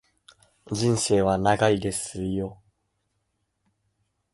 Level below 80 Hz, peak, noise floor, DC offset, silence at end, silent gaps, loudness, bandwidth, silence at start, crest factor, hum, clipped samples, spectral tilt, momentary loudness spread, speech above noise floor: -50 dBFS; -6 dBFS; -75 dBFS; under 0.1%; 1.8 s; none; -24 LUFS; 11.5 kHz; 0.65 s; 22 dB; none; under 0.1%; -5 dB/octave; 10 LU; 52 dB